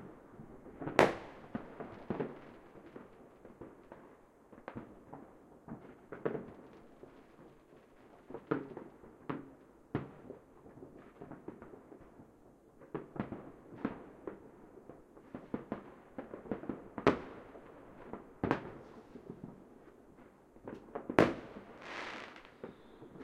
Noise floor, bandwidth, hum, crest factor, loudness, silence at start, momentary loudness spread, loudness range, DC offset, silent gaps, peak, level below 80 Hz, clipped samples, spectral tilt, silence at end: -62 dBFS; 15 kHz; none; 38 dB; -40 LUFS; 0 s; 25 LU; 12 LU; under 0.1%; none; -4 dBFS; -66 dBFS; under 0.1%; -6.5 dB/octave; 0 s